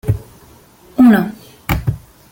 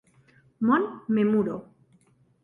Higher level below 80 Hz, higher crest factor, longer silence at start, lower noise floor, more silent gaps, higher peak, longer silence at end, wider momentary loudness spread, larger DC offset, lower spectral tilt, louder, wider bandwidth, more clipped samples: first, -34 dBFS vs -68 dBFS; about the same, 14 dB vs 18 dB; second, 0.05 s vs 0.6 s; second, -45 dBFS vs -62 dBFS; neither; first, -2 dBFS vs -10 dBFS; second, 0.35 s vs 0.8 s; first, 17 LU vs 8 LU; neither; second, -7.5 dB/octave vs -9 dB/octave; first, -15 LUFS vs -25 LUFS; first, 17 kHz vs 3.7 kHz; neither